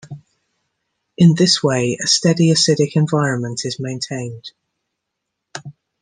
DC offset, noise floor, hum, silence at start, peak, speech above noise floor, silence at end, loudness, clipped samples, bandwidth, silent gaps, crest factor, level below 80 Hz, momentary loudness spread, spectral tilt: under 0.1%; -78 dBFS; none; 0.05 s; -2 dBFS; 62 dB; 0.3 s; -16 LUFS; under 0.1%; 10 kHz; none; 16 dB; -60 dBFS; 21 LU; -4.5 dB/octave